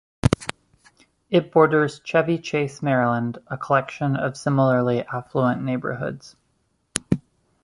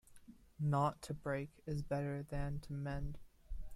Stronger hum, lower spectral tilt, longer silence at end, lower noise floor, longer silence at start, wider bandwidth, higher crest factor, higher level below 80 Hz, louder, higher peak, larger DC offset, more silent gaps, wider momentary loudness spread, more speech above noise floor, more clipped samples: neither; about the same, -6.5 dB/octave vs -7.5 dB/octave; first, 0.45 s vs 0 s; first, -68 dBFS vs -60 dBFS; first, 0.25 s vs 0.1 s; about the same, 11.5 kHz vs 12.5 kHz; first, 22 dB vs 16 dB; first, -46 dBFS vs -52 dBFS; first, -22 LUFS vs -41 LUFS; first, 0 dBFS vs -24 dBFS; neither; neither; about the same, 11 LU vs 13 LU; first, 47 dB vs 20 dB; neither